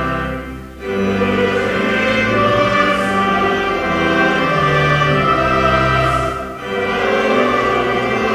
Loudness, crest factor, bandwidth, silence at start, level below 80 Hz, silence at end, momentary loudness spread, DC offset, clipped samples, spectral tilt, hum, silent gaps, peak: -15 LUFS; 14 dB; 16 kHz; 0 s; -34 dBFS; 0 s; 8 LU; under 0.1%; under 0.1%; -5.5 dB/octave; none; none; -2 dBFS